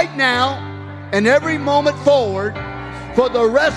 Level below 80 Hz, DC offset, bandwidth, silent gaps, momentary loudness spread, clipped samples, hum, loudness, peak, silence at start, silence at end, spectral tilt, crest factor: -44 dBFS; under 0.1%; 11.5 kHz; none; 14 LU; under 0.1%; none; -16 LUFS; -2 dBFS; 0 s; 0 s; -5 dB/octave; 14 dB